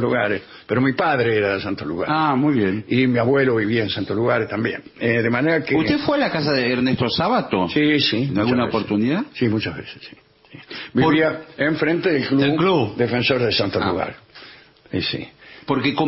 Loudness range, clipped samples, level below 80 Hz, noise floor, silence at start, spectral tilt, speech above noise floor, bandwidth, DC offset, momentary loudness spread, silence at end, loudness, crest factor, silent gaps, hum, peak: 3 LU; under 0.1%; -52 dBFS; -45 dBFS; 0 s; -9.5 dB/octave; 26 dB; 5.8 kHz; under 0.1%; 9 LU; 0 s; -20 LUFS; 14 dB; none; none; -6 dBFS